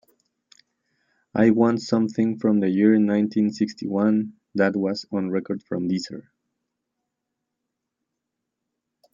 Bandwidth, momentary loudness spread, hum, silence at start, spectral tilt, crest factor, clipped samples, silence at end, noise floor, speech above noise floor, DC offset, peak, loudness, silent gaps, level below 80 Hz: 7.6 kHz; 10 LU; none; 1.35 s; -7 dB/octave; 20 dB; under 0.1%; 2.95 s; -82 dBFS; 61 dB; under 0.1%; -4 dBFS; -22 LUFS; none; -68 dBFS